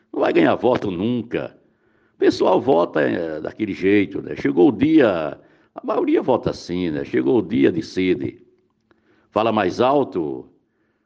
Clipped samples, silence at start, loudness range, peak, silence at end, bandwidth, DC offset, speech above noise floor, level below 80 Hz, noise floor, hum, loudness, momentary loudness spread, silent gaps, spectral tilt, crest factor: under 0.1%; 0.15 s; 3 LU; -4 dBFS; 0.65 s; 7.6 kHz; under 0.1%; 46 dB; -54 dBFS; -65 dBFS; none; -20 LUFS; 10 LU; none; -7 dB/octave; 16 dB